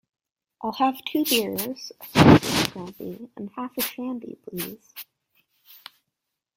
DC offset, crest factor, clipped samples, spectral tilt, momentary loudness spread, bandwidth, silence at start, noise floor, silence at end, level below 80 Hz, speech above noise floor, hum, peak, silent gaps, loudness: under 0.1%; 26 dB; under 0.1%; -5 dB/octave; 21 LU; 16.5 kHz; 0.6 s; -82 dBFS; 1.55 s; -52 dBFS; 59 dB; none; 0 dBFS; none; -23 LUFS